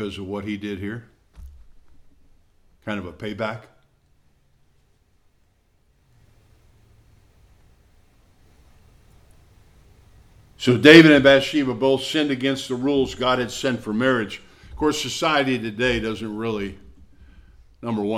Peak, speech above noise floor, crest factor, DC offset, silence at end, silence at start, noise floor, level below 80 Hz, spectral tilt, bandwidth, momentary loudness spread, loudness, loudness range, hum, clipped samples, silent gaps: 0 dBFS; 43 dB; 22 dB; under 0.1%; 0 s; 0 s; -62 dBFS; -50 dBFS; -5 dB/octave; 14.5 kHz; 19 LU; -19 LUFS; 19 LU; none; under 0.1%; none